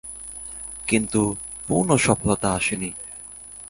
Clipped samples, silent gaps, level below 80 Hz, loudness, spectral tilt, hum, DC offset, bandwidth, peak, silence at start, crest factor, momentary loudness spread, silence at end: under 0.1%; none; -46 dBFS; -23 LUFS; -4.5 dB/octave; 50 Hz at -45 dBFS; under 0.1%; 11.5 kHz; -2 dBFS; 0.05 s; 22 dB; 16 LU; 0 s